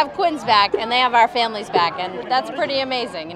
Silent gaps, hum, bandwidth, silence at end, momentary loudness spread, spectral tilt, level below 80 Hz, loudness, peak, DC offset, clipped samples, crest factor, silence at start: none; none; 12.5 kHz; 0 s; 6 LU; -3.5 dB/octave; -58 dBFS; -19 LUFS; 0 dBFS; under 0.1%; under 0.1%; 18 dB; 0 s